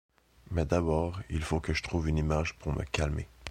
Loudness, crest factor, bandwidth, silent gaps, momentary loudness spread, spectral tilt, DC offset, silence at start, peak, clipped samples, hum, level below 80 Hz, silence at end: -32 LUFS; 18 dB; 12 kHz; none; 7 LU; -6 dB/octave; under 0.1%; 0.45 s; -14 dBFS; under 0.1%; none; -38 dBFS; 0 s